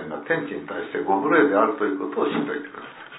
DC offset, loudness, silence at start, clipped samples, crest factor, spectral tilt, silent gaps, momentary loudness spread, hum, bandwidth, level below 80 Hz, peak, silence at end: under 0.1%; -23 LUFS; 0 s; under 0.1%; 18 dB; -9.5 dB/octave; none; 13 LU; none; 4 kHz; -70 dBFS; -4 dBFS; 0 s